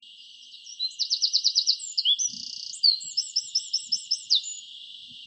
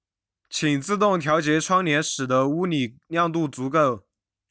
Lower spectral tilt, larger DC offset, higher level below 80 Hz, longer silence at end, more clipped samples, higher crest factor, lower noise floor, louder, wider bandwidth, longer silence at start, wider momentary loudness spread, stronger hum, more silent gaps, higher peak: second, 5 dB/octave vs -4.5 dB/octave; neither; second, -86 dBFS vs -64 dBFS; second, 0 s vs 0.5 s; neither; first, 22 dB vs 14 dB; second, -48 dBFS vs -80 dBFS; about the same, -24 LUFS vs -23 LUFS; first, 9.2 kHz vs 8 kHz; second, 0 s vs 0.5 s; first, 20 LU vs 6 LU; neither; neither; about the same, -8 dBFS vs -8 dBFS